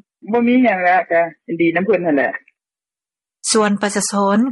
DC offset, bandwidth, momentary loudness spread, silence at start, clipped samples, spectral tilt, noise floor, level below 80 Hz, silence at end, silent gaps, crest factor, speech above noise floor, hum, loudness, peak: under 0.1%; 11.5 kHz; 8 LU; 0.25 s; under 0.1%; -4 dB/octave; under -90 dBFS; -66 dBFS; 0 s; none; 14 dB; over 74 dB; none; -16 LUFS; -4 dBFS